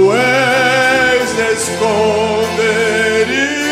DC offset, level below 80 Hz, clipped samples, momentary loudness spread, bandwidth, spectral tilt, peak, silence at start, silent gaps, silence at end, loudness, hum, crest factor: under 0.1%; -46 dBFS; under 0.1%; 4 LU; 16 kHz; -3.5 dB/octave; -2 dBFS; 0 s; none; 0 s; -12 LUFS; none; 12 dB